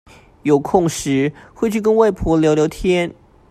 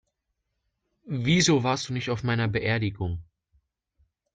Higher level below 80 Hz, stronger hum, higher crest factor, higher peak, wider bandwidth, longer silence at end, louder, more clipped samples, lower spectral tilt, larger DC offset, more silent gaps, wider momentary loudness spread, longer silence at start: first, -38 dBFS vs -54 dBFS; neither; about the same, 16 dB vs 18 dB; first, 0 dBFS vs -10 dBFS; first, 14.5 kHz vs 9.4 kHz; second, 0.4 s vs 1.1 s; first, -17 LUFS vs -26 LUFS; neither; first, -6 dB/octave vs -4.5 dB/octave; neither; neither; second, 8 LU vs 13 LU; second, 0.45 s vs 1.05 s